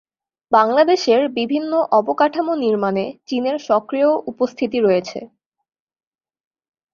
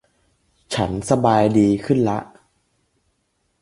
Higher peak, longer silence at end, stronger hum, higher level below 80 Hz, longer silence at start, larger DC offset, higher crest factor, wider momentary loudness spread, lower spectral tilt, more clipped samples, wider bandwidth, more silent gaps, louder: about the same, -2 dBFS vs -2 dBFS; first, 1.7 s vs 1.35 s; neither; second, -64 dBFS vs -48 dBFS; second, 0.5 s vs 0.7 s; neither; about the same, 18 dB vs 20 dB; about the same, 8 LU vs 10 LU; about the same, -5.5 dB/octave vs -6.5 dB/octave; neither; second, 7.4 kHz vs 11.5 kHz; neither; about the same, -18 LUFS vs -19 LUFS